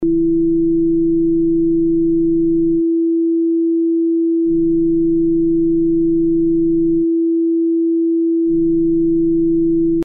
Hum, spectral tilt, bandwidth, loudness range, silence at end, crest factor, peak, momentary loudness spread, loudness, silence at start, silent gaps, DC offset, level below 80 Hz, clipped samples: none; -13 dB/octave; 0.5 kHz; 0 LU; 0 s; 6 dB; -10 dBFS; 1 LU; -15 LUFS; 0 s; none; under 0.1%; -36 dBFS; under 0.1%